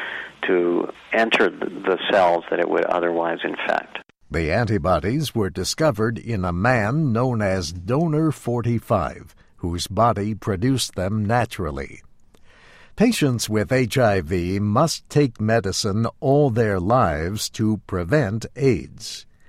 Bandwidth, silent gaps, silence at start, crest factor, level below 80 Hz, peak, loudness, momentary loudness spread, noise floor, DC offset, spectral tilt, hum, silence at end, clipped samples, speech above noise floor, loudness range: 16 kHz; none; 0 s; 16 dB; -44 dBFS; -4 dBFS; -21 LUFS; 8 LU; -49 dBFS; under 0.1%; -5.5 dB/octave; none; 0.25 s; under 0.1%; 28 dB; 3 LU